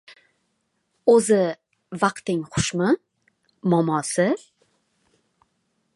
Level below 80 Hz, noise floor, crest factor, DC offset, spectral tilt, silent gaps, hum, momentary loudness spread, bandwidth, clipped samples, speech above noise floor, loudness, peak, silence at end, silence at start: -56 dBFS; -73 dBFS; 20 dB; under 0.1%; -5 dB/octave; none; none; 11 LU; 11.5 kHz; under 0.1%; 52 dB; -22 LUFS; -4 dBFS; 1.6 s; 1.05 s